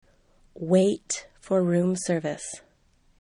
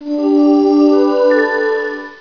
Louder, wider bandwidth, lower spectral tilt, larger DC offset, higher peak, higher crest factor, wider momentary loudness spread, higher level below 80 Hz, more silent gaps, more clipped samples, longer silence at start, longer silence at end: second, -25 LUFS vs -12 LUFS; first, 11 kHz vs 5.4 kHz; about the same, -5.5 dB/octave vs -5 dB/octave; second, under 0.1% vs 0.3%; second, -8 dBFS vs 0 dBFS; first, 18 dB vs 12 dB; first, 15 LU vs 7 LU; second, -62 dBFS vs -56 dBFS; neither; neither; first, 0.55 s vs 0 s; first, 0.6 s vs 0.05 s